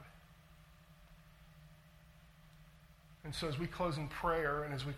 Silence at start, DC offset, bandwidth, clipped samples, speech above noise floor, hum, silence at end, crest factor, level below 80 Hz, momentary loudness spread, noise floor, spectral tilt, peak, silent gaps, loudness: 0 s; under 0.1%; 16.5 kHz; under 0.1%; 24 dB; none; 0 s; 20 dB; -58 dBFS; 26 LU; -62 dBFS; -5.5 dB/octave; -22 dBFS; none; -38 LUFS